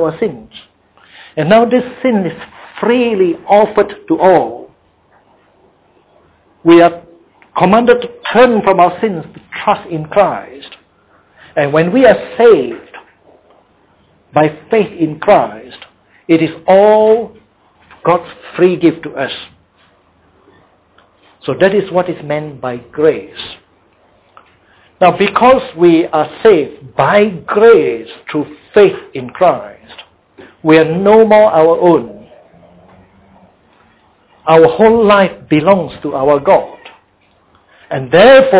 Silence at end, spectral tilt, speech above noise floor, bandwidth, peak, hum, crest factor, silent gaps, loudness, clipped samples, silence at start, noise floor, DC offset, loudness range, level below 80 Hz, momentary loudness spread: 0 s; -10 dB/octave; 42 dB; 4 kHz; 0 dBFS; none; 12 dB; none; -11 LUFS; 0.2%; 0 s; -52 dBFS; under 0.1%; 6 LU; -48 dBFS; 16 LU